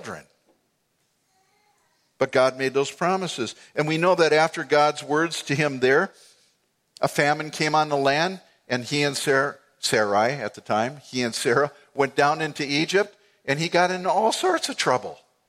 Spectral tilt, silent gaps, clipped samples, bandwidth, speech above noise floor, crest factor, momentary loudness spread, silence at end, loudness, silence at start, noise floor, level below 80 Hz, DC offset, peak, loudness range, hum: -4 dB/octave; none; under 0.1%; 15.5 kHz; 48 dB; 20 dB; 8 LU; 0.35 s; -23 LUFS; 0 s; -71 dBFS; -70 dBFS; under 0.1%; -4 dBFS; 3 LU; none